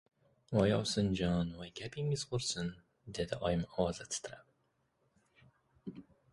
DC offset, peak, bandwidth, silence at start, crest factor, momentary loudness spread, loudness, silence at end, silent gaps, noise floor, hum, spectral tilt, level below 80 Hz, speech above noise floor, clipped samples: under 0.1%; -14 dBFS; 11.5 kHz; 0.5 s; 22 dB; 19 LU; -36 LUFS; 0.3 s; none; -78 dBFS; none; -5 dB/octave; -56 dBFS; 43 dB; under 0.1%